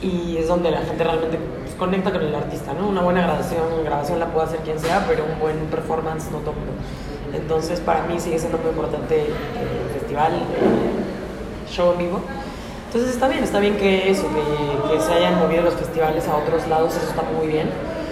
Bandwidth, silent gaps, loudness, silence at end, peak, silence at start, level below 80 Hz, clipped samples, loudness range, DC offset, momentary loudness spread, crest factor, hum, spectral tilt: 14.5 kHz; none; -21 LUFS; 0 s; -4 dBFS; 0 s; -38 dBFS; under 0.1%; 5 LU; under 0.1%; 9 LU; 16 dB; none; -6 dB/octave